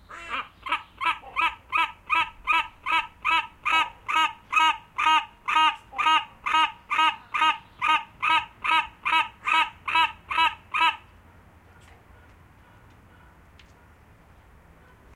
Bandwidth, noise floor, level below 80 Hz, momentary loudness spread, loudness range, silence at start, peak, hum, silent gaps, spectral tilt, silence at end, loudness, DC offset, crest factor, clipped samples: 13.5 kHz; -54 dBFS; -58 dBFS; 5 LU; 4 LU; 0.1 s; -8 dBFS; none; none; -1 dB/octave; 4.15 s; -24 LUFS; under 0.1%; 18 dB; under 0.1%